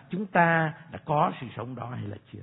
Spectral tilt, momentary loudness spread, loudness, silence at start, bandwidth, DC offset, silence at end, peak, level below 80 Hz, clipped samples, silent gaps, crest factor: -11 dB/octave; 16 LU; -27 LUFS; 0.1 s; 4 kHz; under 0.1%; 0 s; -6 dBFS; -66 dBFS; under 0.1%; none; 22 dB